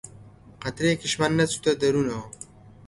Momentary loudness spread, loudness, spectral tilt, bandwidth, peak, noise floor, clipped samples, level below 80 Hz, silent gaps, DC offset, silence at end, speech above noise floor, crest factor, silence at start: 20 LU; -24 LUFS; -4.5 dB/octave; 11.5 kHz; -8 dBFS; -48 dBFS; under 0.1%; -54 dBFS; none; under 0.1%; 0.2 s; 24 dB; 18 dB; 0.05 s